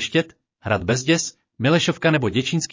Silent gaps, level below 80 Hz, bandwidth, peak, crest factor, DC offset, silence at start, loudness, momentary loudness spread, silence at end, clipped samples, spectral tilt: none; -48 dBFS; 7.6 kHz; -6 dBFS; 16 dB; under 0.1%; 0 s; -21 LUFS; 10 LU; 0.05 s; under 0.1%; -4.5 dB/octave